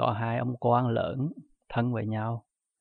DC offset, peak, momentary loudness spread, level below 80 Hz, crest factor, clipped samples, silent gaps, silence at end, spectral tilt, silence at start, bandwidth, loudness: under 0.1%; -10 dBFS; 10 LU; -60 dBFS; 18 dB; under 0.1%; none; 0.4 s; -10.5 dB/octave; 0 s; 4.5 kHz; -30 LUFS